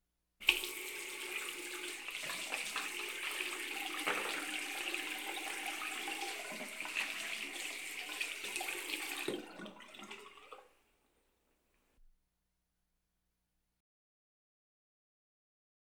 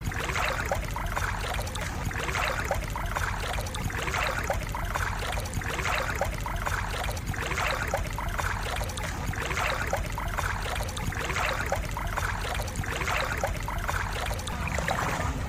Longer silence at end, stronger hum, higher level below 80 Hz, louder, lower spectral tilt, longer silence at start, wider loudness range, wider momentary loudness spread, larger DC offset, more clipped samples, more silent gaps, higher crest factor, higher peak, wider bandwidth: first, 3.7 s vs 0 s; first, 60 Hz at -85 dBFS vs none; second, -74 dBFS vs -36 dBFS; second, -39 LUFS vs -30 LUFS; second, 0 dB/octave vs -4 dB/octave; first, 0.4 s vs 0 s; first, 10 LU vs 1 LU; first, 14 LU vs 4 LU; neither; neither; neither; first, 34 dB vs 16 dB; first, -10 dBFS vs -14 dBFS; first, over 20 kHz vs 15.5 kHz